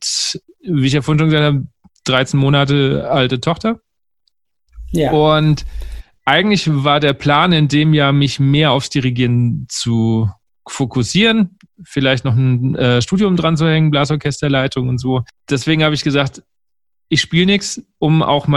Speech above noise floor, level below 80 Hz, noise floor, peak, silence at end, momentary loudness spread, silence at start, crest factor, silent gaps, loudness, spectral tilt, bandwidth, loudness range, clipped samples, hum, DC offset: 70 dB; -38 dBFS; -84 dBFS; 0 dBFS; 0 s; 9 LU; 0 s; 14 dB; none; -15 LUFS; -5.5 dB/octave; 12 kHz; 4 LU; under 0.1%; none; under 0.1%